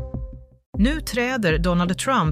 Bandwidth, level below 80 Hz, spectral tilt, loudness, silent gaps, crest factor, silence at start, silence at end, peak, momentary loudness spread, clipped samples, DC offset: 15.5 kHz; -32 dBFS; -5.5 dB/octave; -21 LUFS; 0.66-0.73 s; 14 dB; 0 s; 0 s; -8 dBFS; 14 LU; under 0.1%; under 0.1%